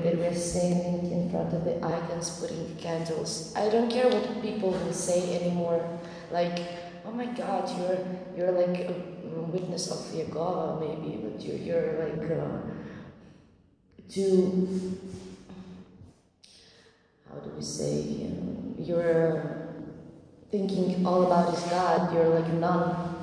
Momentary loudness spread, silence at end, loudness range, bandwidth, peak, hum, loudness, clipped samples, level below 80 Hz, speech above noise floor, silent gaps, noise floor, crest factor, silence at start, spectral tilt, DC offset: 15 LU; 0 s; 7 LU; 11 kHz; -10 dBFS; none; -29 LUFS; under 0.1%; -60 dBFS; 33 dB; none; -61 dBFS; 18 dB; 0 s; -6 dB/octave; under 0.1%